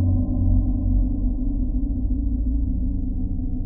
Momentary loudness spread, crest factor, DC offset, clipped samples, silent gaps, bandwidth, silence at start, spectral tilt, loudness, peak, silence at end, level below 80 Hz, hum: 6 LU; 12 dB; under 0.1%; under 0.1%; none; 1.1 kHz; 0 s; -17 dB/octave; -25 LUFS; -8 dBFS; 0 s; -22 dBFS; none